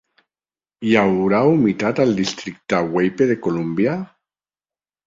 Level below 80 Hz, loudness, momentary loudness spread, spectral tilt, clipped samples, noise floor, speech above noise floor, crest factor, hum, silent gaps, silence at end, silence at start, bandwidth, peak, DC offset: -56 dBFS; -18 LUFS; 10 LU; -6.5 dB/octave; under 0.1%; under -90 dBFS; over 72 dB; 18 dB; none; none; 1 s; 0.8 s; 7.8 kHz; -2 dBFS; under 0.1%